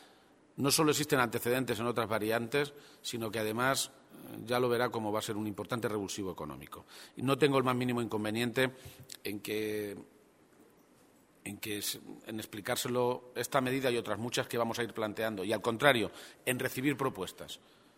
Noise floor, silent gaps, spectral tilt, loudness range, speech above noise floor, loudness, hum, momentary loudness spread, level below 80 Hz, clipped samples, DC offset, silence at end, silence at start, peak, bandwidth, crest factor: -64 dBFS; none; -4 dB/octave; 7 LU; 30 dB; -33 LUFS; none; 16 LU; -68 dBFS; under 0.1%; under 0.1%; 0.4 s; 0 s; -8 dBFS; 16 kHz; 26 dB